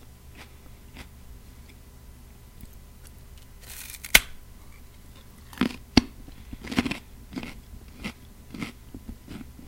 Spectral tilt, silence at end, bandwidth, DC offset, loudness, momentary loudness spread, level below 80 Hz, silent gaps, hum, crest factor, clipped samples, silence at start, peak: -2.5 dB/octave; 0 s; 17 kHz; under 0.1%; -27 LUFS; 26 LU; -44 dBFS; none; none; 32 dB; under 0.1%; 0 s; 0 dBFS